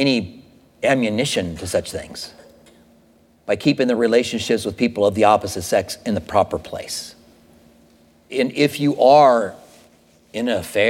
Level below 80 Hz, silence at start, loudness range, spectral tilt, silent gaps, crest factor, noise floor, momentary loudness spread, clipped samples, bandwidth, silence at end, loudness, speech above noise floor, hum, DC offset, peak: -52 dBFS; 0 s; 5 LU; -4.5 dB/octave; none; 18 dB; -54 dBFS; 15 LU; under 0.1%; 17 kHz; 0 s; -19 LUFS; 36 dB; none; under 0.1%; -2 dBFS